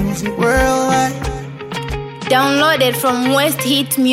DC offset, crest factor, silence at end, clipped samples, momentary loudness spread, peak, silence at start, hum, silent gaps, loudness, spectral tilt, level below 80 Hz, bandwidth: under 0.1%; 14 dB; 0 s; under 0.1%; 12 LU; -2 dBFS; 0 s; none; none; -15 LUFS; -4 dB/octave; -32 dBFS; 16.5 kHz